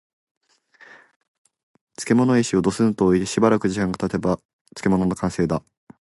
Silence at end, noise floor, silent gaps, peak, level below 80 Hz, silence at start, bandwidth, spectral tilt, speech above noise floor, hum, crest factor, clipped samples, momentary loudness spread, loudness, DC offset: 0.45 s; -52 dBFS; 4.45-4.65 s; -4 dBFS; -48 dBFS; 2 s; 11.5 kHz; -6 dB/octave; 32 dB; none; 20 dB; under 0.1%; 9 LU; -21 LUFS; under 0.1%